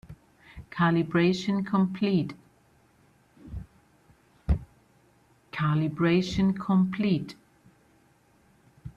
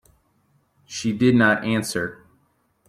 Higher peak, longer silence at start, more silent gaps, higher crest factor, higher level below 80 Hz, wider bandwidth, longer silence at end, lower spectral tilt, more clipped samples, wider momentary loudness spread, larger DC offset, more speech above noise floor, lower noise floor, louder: second, -12 dBFS vs -4 dBFS; second, 0.1 s vs 0.9 s; neither; about the same, 16 dB vs 18 dB; first, -44 dBFS vs -60 dBFS; second, 7.4 kHz vs 15 kHz; second, 0.05 s vs 0.75 s; first, -7.5 dB/octave vs -5 dB/octave; neither; first, 19 LU vs 14 LU; neither; second, 38 dB vs 45 dB; about the same, -63 dBFS vs -65 dBFS; second, -26 LUFS vs -21 LUFS